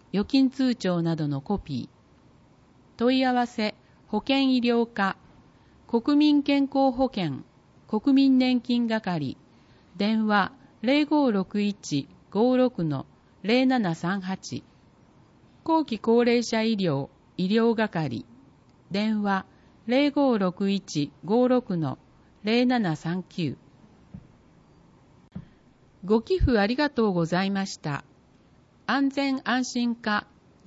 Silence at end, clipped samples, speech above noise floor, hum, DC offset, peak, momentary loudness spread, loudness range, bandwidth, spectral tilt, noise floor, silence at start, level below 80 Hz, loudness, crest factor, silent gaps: 0.45 s; under 0.1%; 34 dB; none; under 0.1%; -10 dBFS; 12 LU; 4 LU; 8 kHz; -6 dB/octave; -58 dBFS; 0.15 s; -48 dBFS; -25 LUFS; 16 dB; none